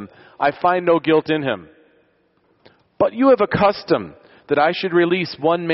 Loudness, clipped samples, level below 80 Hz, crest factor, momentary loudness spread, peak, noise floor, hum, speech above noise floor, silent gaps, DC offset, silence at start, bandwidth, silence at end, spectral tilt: -18 LUFS; under 0.1%; -54 dBFS; 16 dB; 7 LU; -4 dBFS; -61 dBFS; none; 43 dB; none; under 0.1%; 0 s; 6 kHz; 0 s; -4 dB/octave